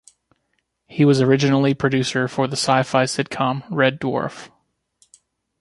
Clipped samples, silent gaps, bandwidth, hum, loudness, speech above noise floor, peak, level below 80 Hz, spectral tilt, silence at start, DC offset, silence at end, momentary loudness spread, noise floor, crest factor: under 0.1%; none; 11.5 kHz; none; -19 LUFS; 53 dB; -2 dBFS; -58 dBFS; -5.5 dB/octave; 0.9 s; under 0.1%; 1.15 s; 9 LU; -71 dBFS; 18 dB